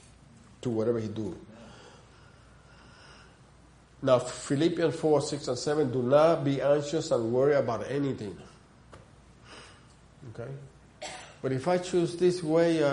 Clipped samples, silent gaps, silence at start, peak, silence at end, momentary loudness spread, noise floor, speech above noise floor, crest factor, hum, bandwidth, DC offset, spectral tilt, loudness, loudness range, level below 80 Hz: under 0.1%; none; 0.65 s; -10 dBFS; 0 s; 22 LU; -56 dBFS; 29 dB; 20 dB; none; 10.5 kHz; under 0.1%; -6 dB/octave; -28 LUFS; 13 LU; -62 dBFS